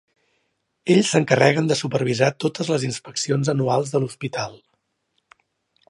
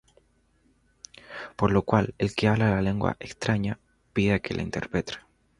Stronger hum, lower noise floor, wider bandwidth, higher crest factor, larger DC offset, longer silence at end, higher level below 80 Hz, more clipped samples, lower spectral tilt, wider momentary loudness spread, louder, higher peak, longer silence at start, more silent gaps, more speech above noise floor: neither; first, -72 dBFS vs -65 dBFS; about the same, 11.5 kHz vs 11 kHz; about the same, 22 dB vs 22 dB; neither; first, 1.35 s vs 0.4 s; second, -64 dBFS vs -48 dBFS; neither; second, -5 dB/octave vs -6.5 dB/octave; second, 11 LU vs 17 LU; first, -21 LUFS vs -26 LUFS; first, 0 dBFS vs -6 dBFS; second, 0.85 s vs 1.3 s; neither; first, 52 dB vs 40 dB